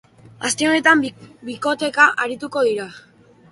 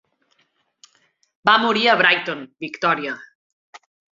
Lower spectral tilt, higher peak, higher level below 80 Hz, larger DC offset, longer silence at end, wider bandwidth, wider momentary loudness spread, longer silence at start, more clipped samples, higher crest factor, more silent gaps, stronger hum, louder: second, -2.5 dB/octave vs -4 dB/octave; about the same, 0 dBFS vs -2 dBFS; first, -64 dBFS vs -70 dBFS; neither; first, 0.5 s vs 0.35 s; first, 11.5 kHz vs 7.6 kHz; about the same, 16 LU vs 16 LU; second, 0.4 s vs 1.45 s; neither; about the same, 20 dB vs 22 dB; second, none vs 3.35-3.73 s; neither; about the same, -18 LUFS vs -18 LUFS